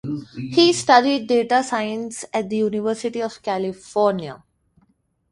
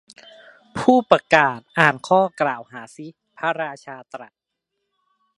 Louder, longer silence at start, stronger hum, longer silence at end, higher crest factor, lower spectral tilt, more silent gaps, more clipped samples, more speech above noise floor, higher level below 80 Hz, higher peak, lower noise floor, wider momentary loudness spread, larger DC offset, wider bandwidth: about the same, -20 LUFS vs -19 LUFS; second, 0.05 s vs 0.75 s; neither; second, 0.95 s vs 1.15 s; about the same, 20 dB vs 22 dB; second, -4 dB/octave vs -5.5 dB/octave; neither; neither; second, 44 dB vs 59 dB; about the same, -62 dBFS vs -62 dBFS; about the same, 0 dBFS vs 0 dBFS; second, -64 dBFS vs -79 dBFS; second, 13 LU vs 23 LU; neither; about the same, 11.5 kHz vs 11.5 kHz